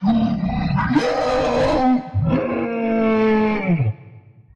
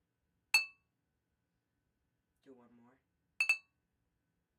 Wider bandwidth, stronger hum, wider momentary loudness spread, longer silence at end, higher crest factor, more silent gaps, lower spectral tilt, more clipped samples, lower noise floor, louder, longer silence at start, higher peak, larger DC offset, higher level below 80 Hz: second, 8.8 kHz vs 13.5 kHz; neither; about the same, 5 LU vs 5 LU; second, 0.35 s vs 1 s; second, 14 dB vs 24 dB; neither; first, -7.5 dB/octave vs 2.5 dB/octave; neither; second, -44 dBFS vs -85 dBFS; first, -19 LUFS vs -33 LUFS; second, 0 s vs 0.55 s; first, -6 dBFS vs -18 dBFS; neither; first, -38 dBFS vs under -90 dBFS